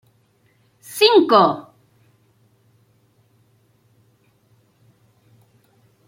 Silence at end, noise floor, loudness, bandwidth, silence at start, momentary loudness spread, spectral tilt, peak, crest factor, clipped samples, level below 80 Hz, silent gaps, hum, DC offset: 4.45 s; -60 dBFS; -15 LUFS; 16.5 kHz; 0.9 s; 20 LU; -4 dB/octave; -2 dBFS; 22 dB; under 0.1%; -72 dBFS; none; none; under 0.1%